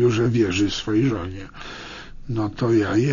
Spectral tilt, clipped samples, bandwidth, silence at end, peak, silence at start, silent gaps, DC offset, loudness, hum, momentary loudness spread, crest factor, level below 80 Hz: -6.5 dB/octave; under 0.1%; 7.4 kHz; 0 s; -8 dBFS; 0 s; none; under 0.1%; -21 LUFS; none; 17 LU; 14 dB; -42 dBFS